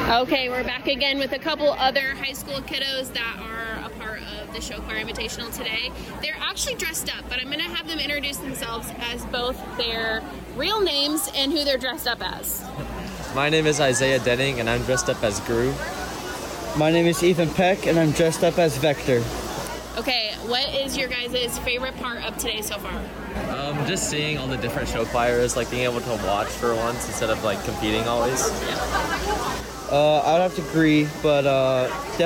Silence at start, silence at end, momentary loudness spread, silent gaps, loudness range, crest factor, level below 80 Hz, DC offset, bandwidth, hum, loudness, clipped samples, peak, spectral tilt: 0 s; 0 s; 11 LU; none; 6 LU; 16 dB; -42 dBFS; under 0.1%; 17.5 kHz; none; -23 LUFS; under 0.1%; -8 dBFS; -4 dB/octave